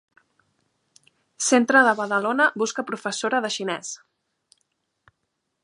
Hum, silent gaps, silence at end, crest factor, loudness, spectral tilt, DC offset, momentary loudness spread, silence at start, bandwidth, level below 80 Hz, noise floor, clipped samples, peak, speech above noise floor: none; none; 1.65 s; 22 dB; -21 LUFS; -2.5 dB/octave; under 0.1%; 13 LU; 1.4 s; 11.5 kHz; -80 dBFS; -77 dBFS; under 0.1%; -2 dBFS; 55 dB